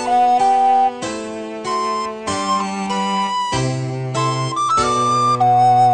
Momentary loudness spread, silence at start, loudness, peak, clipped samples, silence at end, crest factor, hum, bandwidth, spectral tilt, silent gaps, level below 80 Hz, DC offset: 10 LU; 0 s; -17 LUFS; -6 dBFS; under 0.1%; 0 s; 12 dB; none; 9.4 kHz; -4.5 dB/octave; none; -50 dBFS; under 0.1%